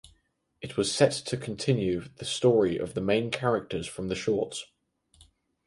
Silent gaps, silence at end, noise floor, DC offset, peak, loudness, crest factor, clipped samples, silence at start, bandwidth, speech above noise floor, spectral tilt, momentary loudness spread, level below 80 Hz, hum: none; 1 s; -70 dBFS; under 0.1%; -8 dBFS; -28 LUFS; 20 dB; under 0.1%; 0.05 s; 11.5 kHz; 43 dB; -5 dB/octave; 11 LU; -58 dBFS; none